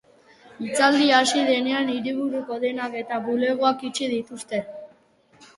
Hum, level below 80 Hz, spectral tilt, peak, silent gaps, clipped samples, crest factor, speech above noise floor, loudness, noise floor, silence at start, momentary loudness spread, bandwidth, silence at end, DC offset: none; -70 dBFS; -2.5 dB/octave; -4 dBFS; none; under 0.1%; 20 dB; 35 dB; -23 LUFS; -58 dBFS; 0.45 s; 12 LU; 11.5 kHz; 0.1 s; under 0.1%